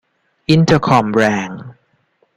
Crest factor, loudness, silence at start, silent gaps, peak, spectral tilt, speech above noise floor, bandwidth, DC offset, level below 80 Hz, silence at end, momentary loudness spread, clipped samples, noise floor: 16 dB; -14 LUFS; 0.5 s; none; 0 dBFS; -6.5 dB/octave; 47 dB; 10.5 kHz; under 0.1%; -48 dBFS; 0.65 s; 16 LU; under 0.1%; -60 dBFS